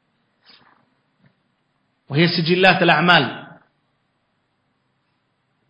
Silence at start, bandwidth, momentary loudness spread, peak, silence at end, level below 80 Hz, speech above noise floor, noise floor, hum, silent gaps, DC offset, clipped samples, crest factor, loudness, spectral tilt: 2.1 s; 8 kHz; 13 LU; 0 dBFS; 2.25 s; -62 dBFS; 53 dB; -69 dBFS; none; none; under 0.1%; under 0.1%; 22 dB; -15 LUFS; -7 dB/octave